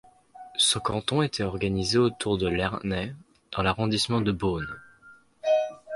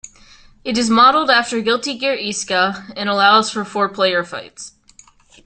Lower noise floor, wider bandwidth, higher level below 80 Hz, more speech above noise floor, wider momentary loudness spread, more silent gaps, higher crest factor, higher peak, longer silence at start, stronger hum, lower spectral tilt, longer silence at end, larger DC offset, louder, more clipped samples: first, -55 dBFS vs -49 dBFS; first, 11.5 kHz vs 10 kHz; first, -48 dBFS vs -56 dBFS; about the same, 29 dB vs 32 dB; second, 11 LU vs 18 LU; neither; about the same, 18 dB vs 16 dB; second, -8 dBFS vs -2 dBFS; first, 0.35 s vs 0.05 s; neither; first, -4.5 dB/octave vs -2.5 dB/octave; second, 0 s vs 0.8 s; neither; second, -26 LUFS vs -16 LUFS; neither